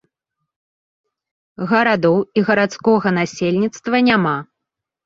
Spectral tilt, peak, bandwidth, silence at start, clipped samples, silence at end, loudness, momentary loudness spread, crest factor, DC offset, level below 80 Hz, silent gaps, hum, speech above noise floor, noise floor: -6 dB/octave; -2 dBFS; 7.8 kHz; 1.6 s; under 0.1%; 0.6 s; -17 LUFS; 6 LU; 18 dB; under 0.1%; -58 dBFS; none; none; 65 dB; -82 dBFS